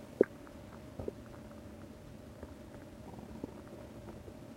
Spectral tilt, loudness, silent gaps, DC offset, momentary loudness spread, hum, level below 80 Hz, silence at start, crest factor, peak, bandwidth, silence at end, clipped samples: -7 dB/octave; -44 LUFS; none; under 0.1%; 17 LU; none; -60 dBFS; 0 s; 34 dB; -10 dBFS; 16 kHz; 0 s; under 0.1%